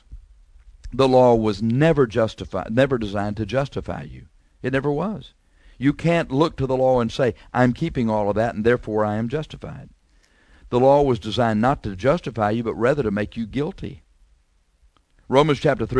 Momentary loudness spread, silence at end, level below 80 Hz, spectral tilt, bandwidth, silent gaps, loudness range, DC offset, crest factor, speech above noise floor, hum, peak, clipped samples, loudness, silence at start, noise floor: 13 LU; 0 s; -44 dBFS; -7.5 dB/octave; 10.5 kHz; none; 5 LU; under 0.1%; 20 dB; 41 dB; none; -2 dBFS; under 0.1%; -21 LUFS; 0.1 s; -61 dBFS